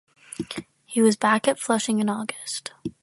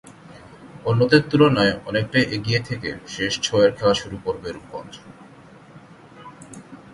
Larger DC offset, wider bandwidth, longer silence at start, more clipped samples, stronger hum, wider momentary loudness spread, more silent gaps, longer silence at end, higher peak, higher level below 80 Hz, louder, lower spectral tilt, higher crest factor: neither; about the same, 11.5 kHz vs 11.5 kHz; first, 0.4 s vs 0.25 s; neither; neither; second, 16 LU vs 24 LU; neither; about the same, 0.1 s vs 0.2 s; second, -4 dBFS vs 0 dBFS; second, -66 dBFS vs -52 dBFS; second, -24 LUFS vs -20 LUFS; second, -4 dB/octave vs -5.5 dB/octave; about the same, 20 dB vs 22 dB